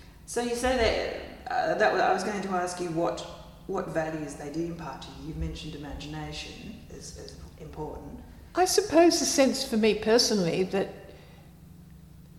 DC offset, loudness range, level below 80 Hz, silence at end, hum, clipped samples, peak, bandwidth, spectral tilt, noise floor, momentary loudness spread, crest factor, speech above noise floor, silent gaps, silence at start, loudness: under 0.1%; 14 LU; -48 dBFS; 0 s; none; under 0.1%; -10 dBFS; 16.5 kHz; -3.5 dB/octave; -50 dBFS; 21 LU; 20 dB; 22 dB; none; 0 s; -27 LUFS